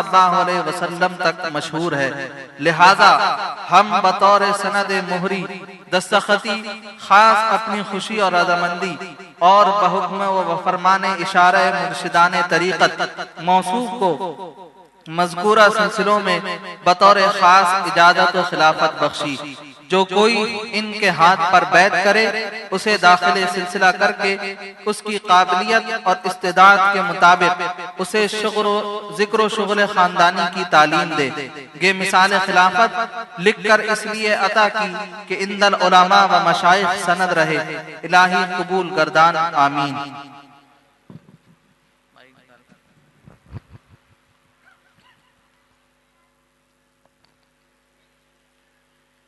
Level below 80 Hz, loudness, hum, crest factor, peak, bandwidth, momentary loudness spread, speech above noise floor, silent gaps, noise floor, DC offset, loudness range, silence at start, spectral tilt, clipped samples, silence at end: -66 dBFS; -16 LUFS; none; 18 dB; 0 dBFS; 12 kHz; 13 LU; 47 dB; none; -63 dBFS; under 0.1%; 4 LU; 0 s; -3.5 dB/octave; under 0.1%; 5.7 s